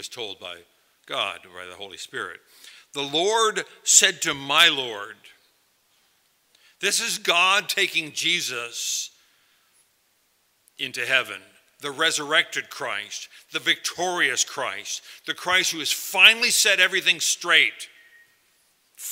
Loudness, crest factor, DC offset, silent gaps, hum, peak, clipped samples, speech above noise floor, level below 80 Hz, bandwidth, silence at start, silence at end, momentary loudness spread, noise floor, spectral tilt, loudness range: -21 LUFS; 24 dB; under 0.1%; none; none; 0 dBFS; under 0.1%; 43 dB; -76 dBFS; 16 kHz; 0 s; 0 s; 20 LU; -66 dBFS; 0.5 dB/octave; 9 LU